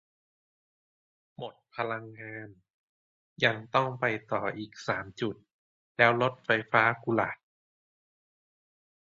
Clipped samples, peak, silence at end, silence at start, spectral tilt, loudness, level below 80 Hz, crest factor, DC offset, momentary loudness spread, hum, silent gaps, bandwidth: under 0.1%; -6 dBFS; 1.85 s; 1.4 s; -6 dB/octave; -29 LUFS; -70 dBFS; 26 dB; under 0.1%; 19 LU; none; 2.70-3.36 s, 5.53-5.95 s; 7.8 kHz